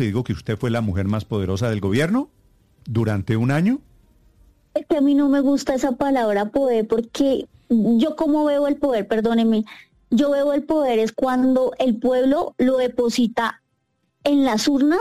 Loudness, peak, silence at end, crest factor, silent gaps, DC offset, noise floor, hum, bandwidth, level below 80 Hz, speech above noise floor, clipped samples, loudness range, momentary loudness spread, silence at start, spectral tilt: -20 LUFS; -8 dBFS; 0 s; 12 dB; none; under 0.1%; -70 dBFS; none; 14.5 kHz; -50 dBFS; 51 dB; under 0.1%; 3 LU; 6 LU; 0 s; -6.5 dB/octave